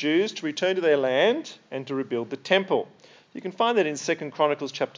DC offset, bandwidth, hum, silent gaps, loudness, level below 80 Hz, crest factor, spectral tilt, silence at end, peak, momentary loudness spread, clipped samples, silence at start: under 0.1%; 7.6 kHz; none; none; -25 LUFS; -86 dBFS; 20 dB; -4 dB/octave; 0.1 s; -6 dBFS; 14 LU; under 0.1%; 0 s